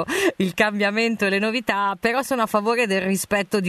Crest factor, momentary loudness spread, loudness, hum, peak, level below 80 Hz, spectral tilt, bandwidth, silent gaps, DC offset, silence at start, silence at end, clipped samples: 18 dB; 2 LU; -21 LUFS; none; -4 dBFS; -58 dBFS; -4 dB/octave; 13.5 kHz; none; under 0.1%; 0 s; 0 s; under 0.1%